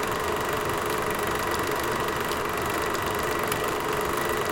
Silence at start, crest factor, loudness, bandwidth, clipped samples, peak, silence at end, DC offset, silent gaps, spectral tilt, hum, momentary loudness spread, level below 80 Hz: 0 s; 16 dB; -27 LUFS; 17 kHz; under 0.1%; -10 dBFS; 0 s; under 0.1%; none; -3.5 dB/octave; none; 1 LU; -46 dBFS